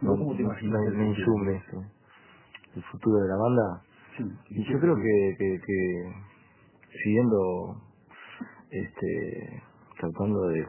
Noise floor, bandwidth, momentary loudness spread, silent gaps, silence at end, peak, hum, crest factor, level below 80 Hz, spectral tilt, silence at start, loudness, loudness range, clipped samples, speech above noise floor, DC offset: -58 dBFS; 3.2 kHz; 19 LU; none; 0 s; -10 dBFS; none; 18 dB; -54 dBFS; -12 dB/octave; 0 s; -28 LUFS; 4 LU; under 0.1%; 31 dB; under 0.1%